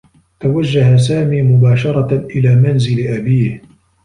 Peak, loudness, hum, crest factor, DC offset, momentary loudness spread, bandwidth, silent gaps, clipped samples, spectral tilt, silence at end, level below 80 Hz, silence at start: -2 dBFS; -13 LUFS; none; 10 dB; under 0.1%; 7 LU; 10 kHz; none; under 0.1%; -8 dB/octave; 0.45 s; -44 dBFS; 0.4 s